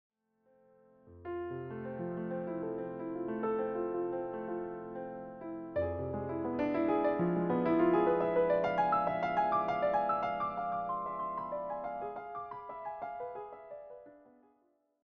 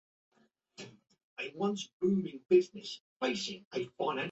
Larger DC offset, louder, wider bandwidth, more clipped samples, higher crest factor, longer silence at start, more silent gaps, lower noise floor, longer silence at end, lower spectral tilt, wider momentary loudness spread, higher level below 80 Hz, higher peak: neither; about the same, -35 LUFS vs -34 LUFS; second, 6.2 kHz vs 8 kHz; neither; about the same, 18 dB vs 22 dB; first, 1.05 s vs 0.8 s; second, none vs 1.24-1.36 s, 1.93-2.00 s, 3.01-3.20 s, 3.65-3.71 s; first, -74 dBFS vs -57 dBFS; first, 0.85 s vs 0 s; first, -6.5 dB/octave vs -5 dB/octave; second, 14 LU vs 22 LU; first, -66 dBFS vs -78 dBFS; second, -18 dBFS vs -14 dBFS